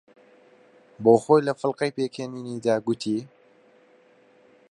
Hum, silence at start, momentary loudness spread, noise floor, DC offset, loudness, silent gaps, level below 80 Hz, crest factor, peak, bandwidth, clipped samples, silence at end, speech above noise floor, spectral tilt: none; 1 s; 12 LU; -57 dBFS; under 0.1%; -24 LUFS; none; -72 dBFS; 22 dB; -4 dBFS; 11 kHz; under 0.1%; 1.45 s; 34 dB; -6.5 dB/octave